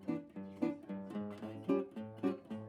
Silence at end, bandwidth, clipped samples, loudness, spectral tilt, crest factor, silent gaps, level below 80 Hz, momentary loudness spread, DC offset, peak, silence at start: 0 s; 11 kHz; under 0.1%; -41 LUFS; -8.5 dB/octave; 18 dB; none; -84 dBFS; 8 LU; under 0.1%; -22 dBFS; 0 s